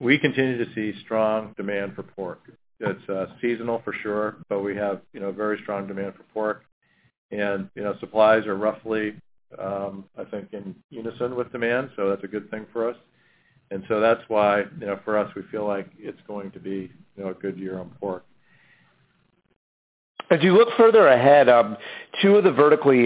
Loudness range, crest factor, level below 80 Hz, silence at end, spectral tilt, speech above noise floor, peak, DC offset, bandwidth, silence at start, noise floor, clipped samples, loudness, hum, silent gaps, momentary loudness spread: 14 LU; 20 dB; -64 dBFS; 0 s; -10 dB/octave; 44 dB; -4 dBFS; under 0.1%; 4 kHz; 0 s; -66 dBFS; under 0.1%; -22 LUFS; none; 6.72-6.81 s, 7.18-7.29 s, 10.84-10.89 s, 19.56-20.15 s; 19 LU